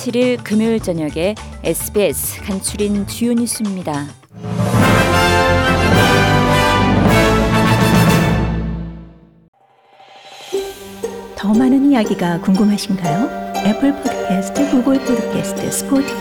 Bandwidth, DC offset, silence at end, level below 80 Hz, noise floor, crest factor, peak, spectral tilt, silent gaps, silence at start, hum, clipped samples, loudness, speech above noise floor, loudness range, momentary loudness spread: 18.5 kHz; under 0.1%; 0 s; -32 dBFS; -48 dBFS; 14 dB; -2 dBFS; -5.5 dB/octave; 9.48-9.53 s; 0 s; none; under 0.1%; -15 LUFS; 32 dB; 7 LU; 12 LU